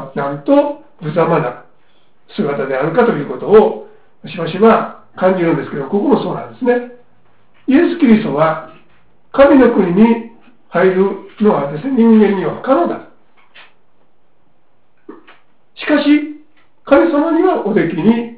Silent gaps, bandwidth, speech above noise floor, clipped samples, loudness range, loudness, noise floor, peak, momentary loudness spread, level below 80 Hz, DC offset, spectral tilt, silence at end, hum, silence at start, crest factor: none; 4 kHz; 48 dB; under 0.1%; 8 LU; -13 LUFS; -60 dBFS; 0 dBFS; 12 LU; -50 dBFS; 0.7%; -11 dB/octave; 0 s; none; 0 s; 14 dB